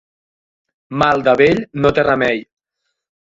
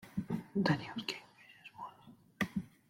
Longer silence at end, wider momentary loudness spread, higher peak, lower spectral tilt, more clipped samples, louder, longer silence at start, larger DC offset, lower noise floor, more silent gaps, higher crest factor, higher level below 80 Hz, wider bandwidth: first, 0.9 s vs 0.25 s; second, 8 LU vs 20 LU; first, 0 dBFS vs -18 dBFS; about the same, -6.5 dB/octave vs -6 dB/octave; neither; first, -15 LUFS vs -38 LUFS; first, 0.9 s vs 0 s; neither; first, -75 dBFS vs -61 dBFS; neither; about the same, 18 dB vs 22 dB; first, -46 dBFS vs -68 dBFS; second, 7.8 kHz vs 16.5 kHz